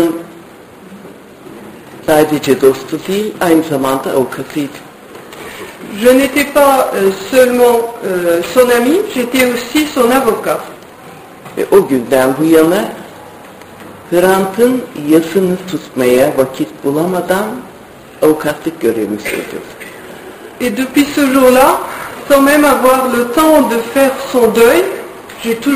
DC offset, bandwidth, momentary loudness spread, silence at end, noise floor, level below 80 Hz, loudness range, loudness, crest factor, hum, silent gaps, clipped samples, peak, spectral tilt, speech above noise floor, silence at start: under 0.1%; 16 kHz; 20 LU; 0 s; -35 dBFS; -46 dBFS; 6 LU; -12 LUFS; 12 dB; none; none; 0.3%; 0 dBFS; -4.5 dB/octave; 24 dB; 0 s